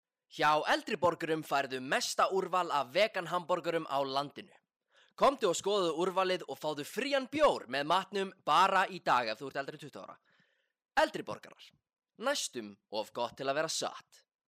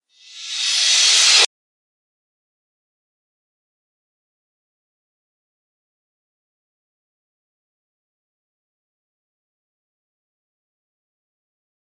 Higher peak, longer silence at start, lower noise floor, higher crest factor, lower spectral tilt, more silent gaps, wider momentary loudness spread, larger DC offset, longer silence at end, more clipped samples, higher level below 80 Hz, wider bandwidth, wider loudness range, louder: second, -18 dBFS vs 0 dBFS; about the same, 0.35 s vs 0.35 s; first, -74 dBFS vs -38 dBFS; second, 16 dB vs 24 dB; first, -3 dB/octave vs 7.5 dB/octave; neither; about the same, 13 LU vs 11 LU; neither; second, 0.45 s vs 10.55 s; neither; first, -72 dBFS vs under -90 dBFS; first, 15.5 kHz vs 11.5 kHz; about the same, 7 LU vs 5 LU; second, -32 LUFS vs -13 LUFS